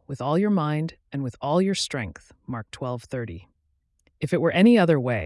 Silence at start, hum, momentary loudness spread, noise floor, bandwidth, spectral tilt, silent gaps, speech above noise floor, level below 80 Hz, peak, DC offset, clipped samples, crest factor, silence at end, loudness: 0.1 s; none; 18 LU; -70 dBFS; 12 kHz; -6 dB/octave; none; 47 dB; -58 dBFS; -8 dBFS; under 0.1%; under 0.1%; 16 dB; 0 s; -23 LUFS